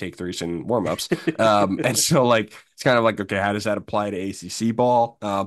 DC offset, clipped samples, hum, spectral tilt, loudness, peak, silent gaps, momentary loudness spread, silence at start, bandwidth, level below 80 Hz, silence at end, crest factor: under 0.1%; under 0.1%; none; -4.5 dB/octave; -21 LUFS; -4 dBFS; none; 10 LU; 0 s; 12.5 kHz; -58 dBFS; 0 s; 18 dB